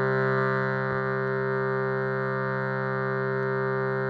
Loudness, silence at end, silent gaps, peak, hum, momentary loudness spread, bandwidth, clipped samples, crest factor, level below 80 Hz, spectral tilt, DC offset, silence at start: -27 LUFS; 0 s; none; -14 dBFS; none; 3 LU; 5.2 kHz; under 0.1%; 12 dB; -62 dBFS; -9.5 dB/octave; under 0.1%; 0 s